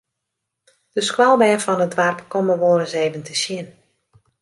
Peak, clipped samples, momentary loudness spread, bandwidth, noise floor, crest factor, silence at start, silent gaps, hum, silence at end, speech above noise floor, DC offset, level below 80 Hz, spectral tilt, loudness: -2 dBFS; under 0.1%; 11 LU; 11.5 kHz; -79 dBFS; 18 dB; 0.95 s; none; none; 0.7 s; 61 dB; under 0.1%; -68 dBFS; -4 dB/octave; -18 LUFS